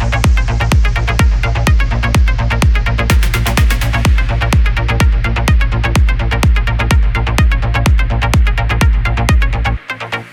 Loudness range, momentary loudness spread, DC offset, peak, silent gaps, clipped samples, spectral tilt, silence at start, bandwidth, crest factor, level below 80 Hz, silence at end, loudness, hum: 0 LU; 2 LU; under 0.1%; 0 dBFS; none; under 0.1%; -5.5 dB/octave; 0 s; 17.5 kHz; 10 dB; -12 dBFS; 0 s; -13 LUFS; none